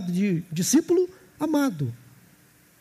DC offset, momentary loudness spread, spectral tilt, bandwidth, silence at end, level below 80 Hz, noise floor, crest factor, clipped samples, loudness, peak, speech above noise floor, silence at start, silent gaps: under 0.1%; 11 LU; -5.5 dB/octave; 15.5 kHz; 0.85 s; -68 dBFS; -57 dBFS; 16 dB; under 0.1%; -25 LUFS; -10 dBFS; 34 dB; 0 s; none